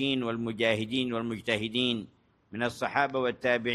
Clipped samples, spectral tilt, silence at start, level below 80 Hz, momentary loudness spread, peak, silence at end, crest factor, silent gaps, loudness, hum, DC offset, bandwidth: under 0.1%; -5 dB/octave; 0 s; -66 dBFS; 6 LU; -10 dBFS; 0 s; 20 dB; none; -29 LUFS; none; under 0.1%; 12.5 kHz